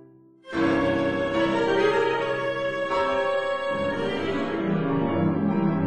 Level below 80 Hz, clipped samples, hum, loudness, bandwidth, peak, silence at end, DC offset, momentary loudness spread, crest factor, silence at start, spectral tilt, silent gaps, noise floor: -54 dBFS; under 0.1%; none; -24 LUFS; 9.6 kHz; -10 dBFS; 0 s; 0.3%; 5 LU; 14 dB; 0 s; -7 dB/octave; none; -49 dBFS